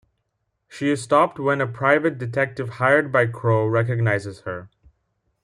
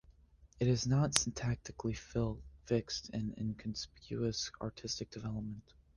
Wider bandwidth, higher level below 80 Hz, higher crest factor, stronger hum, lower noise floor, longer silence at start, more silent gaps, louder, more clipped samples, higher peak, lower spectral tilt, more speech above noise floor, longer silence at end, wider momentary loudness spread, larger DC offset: about the same, 11 kHz vs 10 kHz; second, -62 dBFS vs -56 dBFS; second, 18 dB vs 32 dB; neither; first, -74 dBFS vs -63 dBFS; first, 0.7 s vs 0.1 s; neither; first, -21 LUFS vs -37 LUFS; neither; about the same, -4 dBFS vs -6 dBFS; first, -7 dB/octave vs -4.5 dB/octave; first, 54 dB vs 26 dB; first, 0.8 s vs 0.35 s; second, 8 LU vs 12 LU; neither